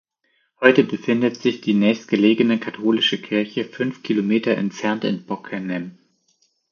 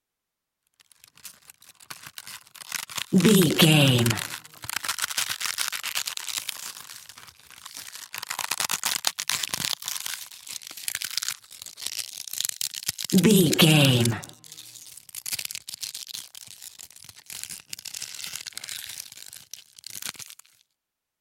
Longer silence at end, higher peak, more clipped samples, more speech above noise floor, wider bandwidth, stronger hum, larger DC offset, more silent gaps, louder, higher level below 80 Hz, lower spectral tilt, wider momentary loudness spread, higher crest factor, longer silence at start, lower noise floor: about the same, 0.8 s vs 0.9 s; about the same, 0 dBFS vs -2 dBFS; neither; second, 48 dB vs 66 dB; second, 7 kHz vs 17 kHz; neither; neither; neither; first, -20 LUFS vs -25 LUFS; about the same, -70 dBFS vs -66 dBFS; first, -6 dB/octave vs -3.5 dB/octave; second, 11 LU vs 23 LU; second, 20 dB vs 26 dB; second, 0.6 s vs 1.25 s; second, -67 dBFS vs -85 dBFS